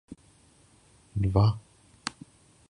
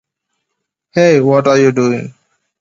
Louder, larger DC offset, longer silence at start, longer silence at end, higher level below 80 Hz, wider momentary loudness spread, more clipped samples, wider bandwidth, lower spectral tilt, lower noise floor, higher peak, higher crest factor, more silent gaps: second, -29 LUFS vs -12 LUFS; neither; second, 0.1 s vs 0.95 s; about the same, 0.6 s vs 0.5 s; first, -44 dBFS vs -60 dBFS; first, 23 LU vs 12 LU; neither; first, 10.5 kHz vs 7.8 kHz; about the same, -7 dB/octave vs -6.5 dB/octave; second, -60 dBFS vs -74 dBFS; second, -10 dBFS vs 0 dBFS; first, 22 dB vs 14 dB; neither